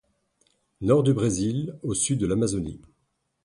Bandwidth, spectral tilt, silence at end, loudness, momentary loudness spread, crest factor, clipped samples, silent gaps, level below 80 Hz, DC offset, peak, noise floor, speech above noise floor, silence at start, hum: 11.5 kHz; -6 dB/octave; 0.65 s; -25 LUFS; 10 LU; 18 dB; under 0.1%; none; -50 dBFS; under 0.1%; -8 dBFS; -74 dBFS; 51 dB; 0.8 s; none